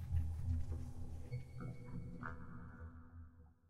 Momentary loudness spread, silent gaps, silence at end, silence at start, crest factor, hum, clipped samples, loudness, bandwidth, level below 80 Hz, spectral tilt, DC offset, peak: 15 LU; none; 0 s; 0 s; 18 dB; none; under 0.1%; -47 LUFS; 11 kHz; -50 dBFS; -8.5 dB/octave; under 0.1%; -28 dBFS